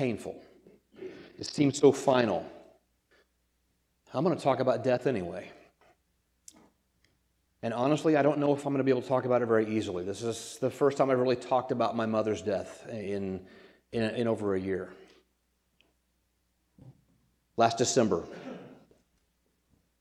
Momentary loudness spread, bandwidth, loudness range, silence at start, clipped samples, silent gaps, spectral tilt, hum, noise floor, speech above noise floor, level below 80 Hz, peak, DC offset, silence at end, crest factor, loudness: 18 LU; 13 kHz; 7 LU; 0 s; under 0.1%; none; -5.5 dB/octave; none; -75 dBFS; 47 dB; -70 dBFS; -8 dBFS; under 0.1%; 1.25 s; 22 dB; -29 LUFS